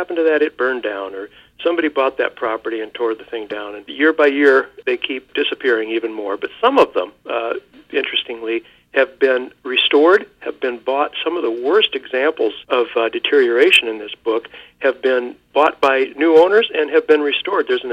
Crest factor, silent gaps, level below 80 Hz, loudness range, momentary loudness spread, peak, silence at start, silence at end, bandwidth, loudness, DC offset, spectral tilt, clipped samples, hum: 16 dB; none; -62 dBFS; 4 LU; 12 LU; -2 dBFS; 0 s; 0 s; 10 kHz; -17 LUFS; under 0.1%; -3 dB/octave; under 0.1%; none